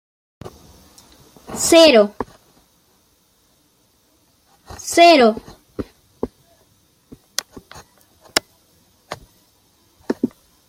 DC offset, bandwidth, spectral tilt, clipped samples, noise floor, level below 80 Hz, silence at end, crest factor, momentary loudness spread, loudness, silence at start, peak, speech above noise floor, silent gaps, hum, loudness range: under 0.1%; 16.5 kHz; -2.5 dB/octave; under 0.1%; -59 dBFS; -52 dBFS; 0.4 s; 20 dB; 26 LU; -15 LUFS; 1.5 s; 0 dBFS; 47 dB; none; none; 12 LU